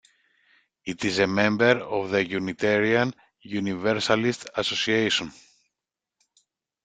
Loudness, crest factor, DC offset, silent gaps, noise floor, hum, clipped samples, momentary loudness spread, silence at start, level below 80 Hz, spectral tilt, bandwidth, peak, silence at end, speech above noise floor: -24 LUFS; 22 dB; under 0.1%; none; -87 dBFS; none; under 0.1%; 9 LU; 0.85 s; -62 dBFS; -4.5 dB/octave; 9.4 kHz; -4 dBFS; 1.55 s; 63 dB